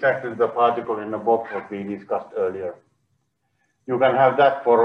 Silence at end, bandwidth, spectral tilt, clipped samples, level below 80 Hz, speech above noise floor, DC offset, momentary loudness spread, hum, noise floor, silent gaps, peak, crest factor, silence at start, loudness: 0 s; 5.6 kHz; -7.5 dB/octave; under 0.1%; -72 dBFS; 50 dB; under 0.1%; 14 LU; none; -71 dBFS; none; -4 dBFS; 18 dB; 0 s; -21 LUFS